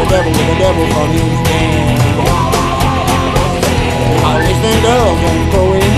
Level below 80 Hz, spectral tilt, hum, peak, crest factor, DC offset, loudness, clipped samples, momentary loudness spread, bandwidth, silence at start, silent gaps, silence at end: -22 dBFS; -5.5 dB/octave; none; 0 dBFS; 10 dB; 0.4%; -12 LUFS; under 0.1%; 2 LU; 13.5 kHz; 0 s; none; 0 s